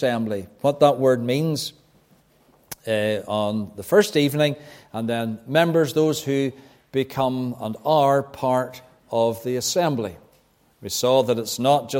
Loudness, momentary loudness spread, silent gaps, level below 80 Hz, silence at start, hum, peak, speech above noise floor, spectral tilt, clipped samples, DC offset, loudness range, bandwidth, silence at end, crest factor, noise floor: -22 LUFS; 11 LU; none; -62 dBFS; 0 s; none; -2 dBFS; 38 dB; -5 dB/octave; under 0.1%; under 0.1%; 2 LU; 16.5 kHz; 0 s; 20 dB; -60 dBFS